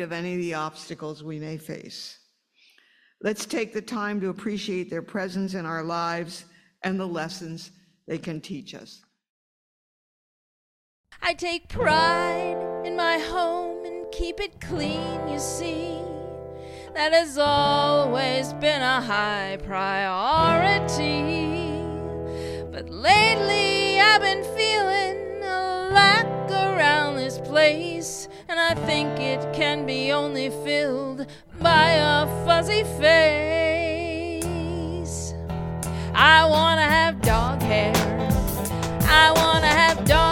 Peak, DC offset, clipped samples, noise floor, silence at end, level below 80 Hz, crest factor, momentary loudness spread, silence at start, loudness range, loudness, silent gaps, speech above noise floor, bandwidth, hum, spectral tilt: 0 dBFS; under 0.1%; under 0.1%; -62 dBFS; 0 s; -40 dBFS; 22 dB; 18 LU; 0 s; 14 LU; -22 LUFS; 9.29-11.04 s; 40 dB; 16 kHz; none; -4 dB/octave